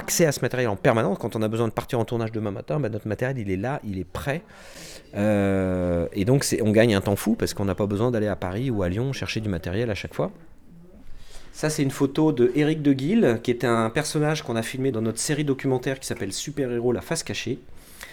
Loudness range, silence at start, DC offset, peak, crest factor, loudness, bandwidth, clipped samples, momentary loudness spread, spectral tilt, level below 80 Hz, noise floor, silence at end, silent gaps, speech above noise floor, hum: 6 LU; 0 s; under 0.1%; -6 dBFS; 18 dB; -24 LUFS; over 20 kHz; under 0.1%; 9 LU; -5.5 dB/octave; -50 dBFS; -46 dBFS; 0 s; none; 22 dB; none